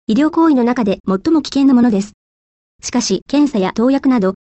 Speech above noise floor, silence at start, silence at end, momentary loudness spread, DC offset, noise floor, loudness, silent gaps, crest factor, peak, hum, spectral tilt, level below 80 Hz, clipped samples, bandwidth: over 76 dB; 0.1 s; 0.1 s; 7 LU; under 0.1%; under -90 dBFS; -14 LUFS; 1.00-1.04 s, 2.14-2.79 s, 3.22-3.26 s; 10 dB; -4 dBFS; none; -5.5 dB/octave; -48 dBFS; under 0.1%; 8.4 kHz